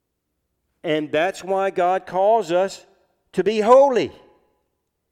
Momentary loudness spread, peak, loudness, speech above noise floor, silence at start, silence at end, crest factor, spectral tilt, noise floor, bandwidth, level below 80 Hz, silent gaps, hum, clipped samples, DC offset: 14 LU; -2 dBFS; -19 LUFS; 57 dB; 0.85 s; 1 s; 20 dB; -5 dB/octave; -76 dBFS; 12 kHz; -64 dBFS; none; none; under 0.1%; under 0.1%